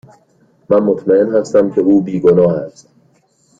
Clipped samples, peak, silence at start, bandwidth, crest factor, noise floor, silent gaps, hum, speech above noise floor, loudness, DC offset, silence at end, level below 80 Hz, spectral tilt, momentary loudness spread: under 0.1%; 0 dBFS; 0.7 s; 7.8 kHz; 14 dB; -55 dBFS; none; none; 43 dB; -13 LUFS; under 0.1%; 0.9 s; -52 dBFS; -8.5 dB/octave; 4 LU